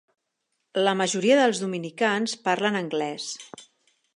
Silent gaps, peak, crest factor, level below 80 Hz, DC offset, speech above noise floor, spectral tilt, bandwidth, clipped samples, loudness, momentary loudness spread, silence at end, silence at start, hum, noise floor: none; -6 dBFS; 18 dB; -78 dBFS; under 0.1%; 54 dB; -3.5 dB/octave; 11.5 kHz; under 0.1%; -24 LUFS; 13 LU; 0.55 s; 0.75 s; none; -78 dBFS